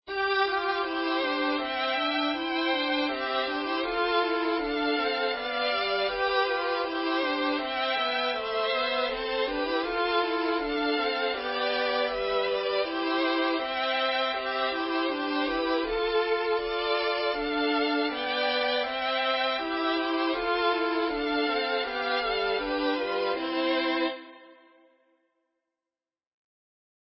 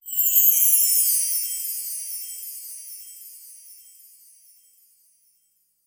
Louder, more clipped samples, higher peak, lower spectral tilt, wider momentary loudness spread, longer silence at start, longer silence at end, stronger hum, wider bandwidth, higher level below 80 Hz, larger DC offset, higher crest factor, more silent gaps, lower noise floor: second, -27 LUFS vs -18 LUFS; neither; second, -14 dBFS vs -4 dBFS; first, -6.5 dB/octave vs 8 dB/octave; second, 3 LU vs 24 LU; about the same, 0.05 s vs 0.05 s; first, 2.55 s vs 2.1 s; neither; second, 5.8 kHz vs over 20 kHz; first, -58 dBFS vs -82 dBFS; neither; second, 14 dB vs 22 dB; neither; first, under -90 dBFS vs -67 dBFS